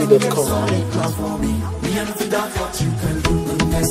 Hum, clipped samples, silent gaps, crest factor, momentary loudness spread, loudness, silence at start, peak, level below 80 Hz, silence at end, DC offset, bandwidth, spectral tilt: none; under 0.1%; none; 18 dB; 5 LU; -20 LUFS; 0 s; 0 dBFS; -30 dBFS; 0 s; under 0.1%; 16 kHz; -5.5 dB/octave